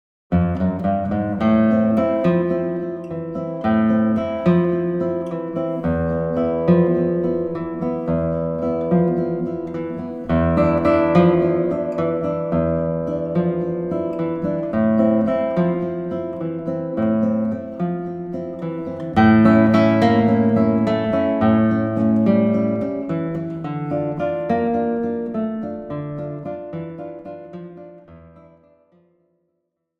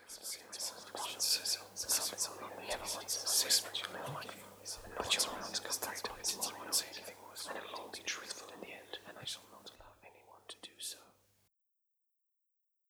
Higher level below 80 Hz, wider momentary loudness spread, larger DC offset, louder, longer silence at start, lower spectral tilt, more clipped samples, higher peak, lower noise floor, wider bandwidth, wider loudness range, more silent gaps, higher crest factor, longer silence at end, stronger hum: first, -48 dBFS vs -70 dBFS; second, 12 LU vs 17 LU; neither; first, -20 LUFS vs -37 LUFS; first, 0.3 s vs 0 s; first, -10 dB/octave vs 0 dB/octave; neither; first, -2 dBFS vs -16 dBFS; second, -74 dBFS vs -84 dBFS; second, 6 kHz vs over 20 kHz; second, 8 LU vs 15 LU; neither; second, 16 dB vs 24 dB; about the same, 1.7 s vs 1.8 s; neither